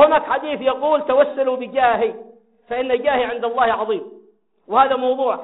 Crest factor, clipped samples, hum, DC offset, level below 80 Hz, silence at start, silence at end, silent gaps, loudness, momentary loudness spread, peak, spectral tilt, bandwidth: 18 dB; under 0.1%; none; under 0.1%; -58 dBFS; 0 s; 0 s; none; -19 LUFS; 9 LU; -2 dBFS; -1.5 dB/octave; 4.1 kHz